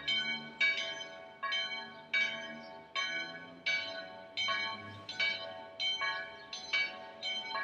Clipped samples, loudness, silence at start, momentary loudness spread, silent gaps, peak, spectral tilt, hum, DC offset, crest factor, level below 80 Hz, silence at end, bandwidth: under 0.1%; -35 LUFS; 0 s; 12 LU; none; -18 dBFS; -1 dB/octave; none; under 0.1%; 18 dB; -78 dBFS; 0 s; 9.8 kHz